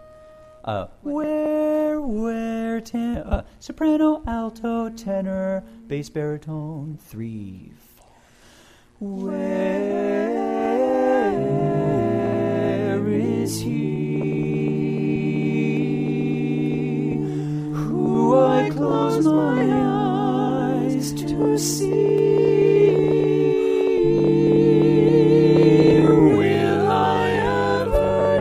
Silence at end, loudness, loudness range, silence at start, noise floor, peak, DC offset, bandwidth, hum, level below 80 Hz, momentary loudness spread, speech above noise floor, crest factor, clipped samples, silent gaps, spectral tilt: 0 s; -20 LUFS; 12 LU; 0.65 s; -52 dBFS; -2 dBFS; under 0.1%; 15.5 kHz; none; -42 dBFS; 13 LU; 29 dB; 18 dB; under 0.1%; none; -7 dB/octave